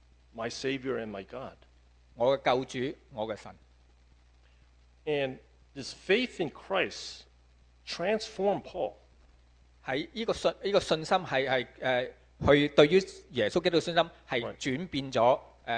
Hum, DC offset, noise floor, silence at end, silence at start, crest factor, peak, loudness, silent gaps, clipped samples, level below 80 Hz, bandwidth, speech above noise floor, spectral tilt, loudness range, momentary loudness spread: none; under 0.1%; -61 dBFS; 0 s; 0.35 s; 26 dB; -6 dBFS; -30 LUFS; none; under 0.1%; -58 dBFS; 9.8 kHz; 31 dB; -5 dB/octave; 8 LU; 16 LU